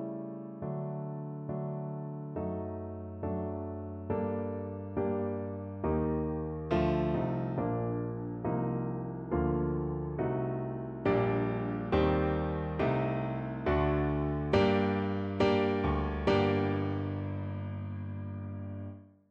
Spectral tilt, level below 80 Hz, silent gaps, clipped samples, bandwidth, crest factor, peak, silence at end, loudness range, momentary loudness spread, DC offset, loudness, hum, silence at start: -9 dB/octave; -46 dBFS; none; under 0.1%; 7.4 kHz; 18 dB; -14 dBFS; 0.25 s; 7 LU; 11 LU; under 0.1%; -33 LUFS; none; 0 s